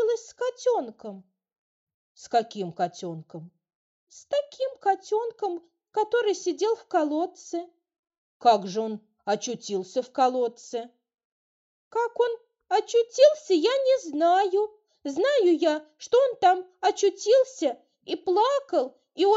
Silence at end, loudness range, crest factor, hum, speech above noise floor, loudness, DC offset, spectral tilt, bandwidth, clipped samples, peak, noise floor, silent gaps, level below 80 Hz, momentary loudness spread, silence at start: 0 s; 8 LU; 20 dB; none; over 65 dB; -25 LUFS; under 0.1%; -2.5 dB/octave; 8 kHz; under 0.1%; -6 dBFS; under -90 dBFS; 1.59-1.87 s, 1.94-2.15 s, 3.75-4.07 s, 7.99-8.03 s, 8.18-8.40 s, 11.24-11.91 s; -80 dBFS; 14 LU; 0 s